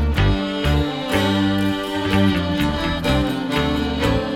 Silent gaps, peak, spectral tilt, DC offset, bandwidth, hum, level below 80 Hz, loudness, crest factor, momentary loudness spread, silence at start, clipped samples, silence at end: none; -4 dBFS; -6 dB/octave; under 0.1%; 17 kHz; none; -28 dBFS; -20 LUFS; 14 dB; 3 LU; 0 s; under 0.1%; 0 s